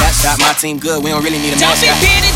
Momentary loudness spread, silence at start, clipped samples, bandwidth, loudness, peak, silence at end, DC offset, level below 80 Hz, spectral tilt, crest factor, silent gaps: 7 LU; 0 s; under 0.1%; 17.5 kHz; -11 LUFS; 0 dBFS; 0 s; under 0.1%; -22 dBFS; -2.5 dB/octave; 12 dB; none